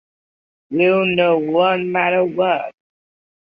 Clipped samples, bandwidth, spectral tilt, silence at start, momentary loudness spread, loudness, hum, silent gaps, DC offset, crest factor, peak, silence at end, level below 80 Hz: under 0.1%; 5 kHz; -8.5 dB/octave; 0.7 s; 7 LU; -17 LUFS; none; none; under 0.1%; 16 dB; -4 dBFS; 0.75 s; -62 dBFS